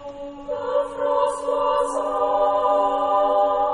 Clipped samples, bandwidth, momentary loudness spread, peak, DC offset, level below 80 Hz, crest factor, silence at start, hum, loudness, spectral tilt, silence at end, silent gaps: under 0.1%; 10.5 kHz; 9 LU; -8 dBFS; under 0.1%; -50 dBFS; 14 dB; 0 s; none; -21 LUFS; -4 dB/octave; 0 s; none